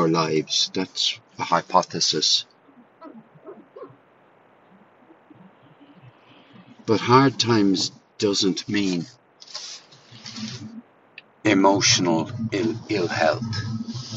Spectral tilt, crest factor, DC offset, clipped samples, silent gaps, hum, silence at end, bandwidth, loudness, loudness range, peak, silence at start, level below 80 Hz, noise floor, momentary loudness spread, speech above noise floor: -3.5 dB/octave; 22 dB; under 0.1%; under 0.1%; none; none; 0 s; 8.2 kHz; -21 LUFS; 6 LU; -2 dBFS; 0 s; -64 dBFS; -56 dBFS; 20 LU; 34 dB